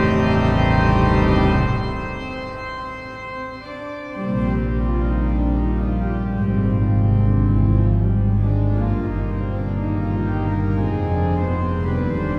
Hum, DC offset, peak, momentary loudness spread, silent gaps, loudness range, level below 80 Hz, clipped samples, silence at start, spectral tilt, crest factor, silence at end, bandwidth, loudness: none; under 0.1%; -4 dBFS; 12 LU; none; 6 LU; -26 dBFS; under 0.1%; 0 s; -9 dB/octave; 14 dB; 0 s; 6.6 kHz; -20 LUFS